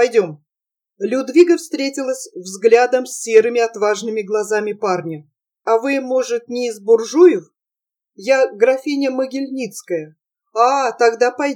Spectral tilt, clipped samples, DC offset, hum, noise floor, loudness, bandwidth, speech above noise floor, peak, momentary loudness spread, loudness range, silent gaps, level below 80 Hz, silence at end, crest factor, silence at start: -4 dB/octave; under 0.1%; under 0.1%; none; -87 dBFS; -17 LUFS; 14.5 kHz; 71 dB; 0 dBFS; 13 LU; 4 LU; none; -88 dBFS; 0 s; 16 dB; 0 s